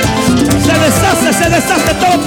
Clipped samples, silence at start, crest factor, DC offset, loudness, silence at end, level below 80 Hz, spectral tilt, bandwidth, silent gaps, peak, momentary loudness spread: under 0.1%; 0 s; 10 dB; under 0.1%; -10 LUFS; 0 s; -28 dBFS; -4 dB/octave; 19 kHz; none; 0 dBFS; 2 LU